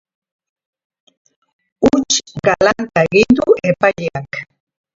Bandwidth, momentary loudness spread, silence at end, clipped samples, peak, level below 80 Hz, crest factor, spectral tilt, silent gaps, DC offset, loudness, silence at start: 7.8 kHz; 12 LU; 0.55 s; under 0.1%; 0 dBFS; -46 dBFS; 16 dB; -4 dB/octave; none; under 0.1%; -14 LUFS; 1.8 s